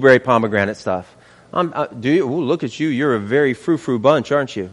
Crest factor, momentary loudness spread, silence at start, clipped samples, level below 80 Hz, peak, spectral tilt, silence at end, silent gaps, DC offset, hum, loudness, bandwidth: 18 dB; 7 LU; 0 s; under 0.1%; -58 dBFS; 0 dBFS; -6.5 dB/octave; 0 s; none; under 0.1%; none; -18 LUFS; 11 kHz